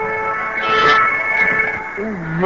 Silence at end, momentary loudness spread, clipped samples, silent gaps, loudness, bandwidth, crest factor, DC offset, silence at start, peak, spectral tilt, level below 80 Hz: 0 s; 11 LU; under 0.1%; none; -15 LUFS; 7.6 kHz; 16 dB; 0.4%; 0 s; 0 dBFS; -5 dB/octave; -46 dBFS